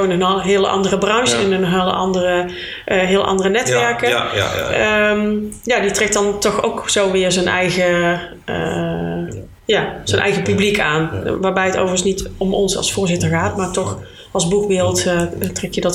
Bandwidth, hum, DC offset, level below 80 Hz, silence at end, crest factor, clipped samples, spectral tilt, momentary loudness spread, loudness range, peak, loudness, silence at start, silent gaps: 16.5 kHz; none; under 0.1%; -40 dBFS; 0 s; 16 dB; under 0.1%; -4 dB/octave; 7 LU; 2 LU; 0 dBFS; -17 LUFS; 0 s; none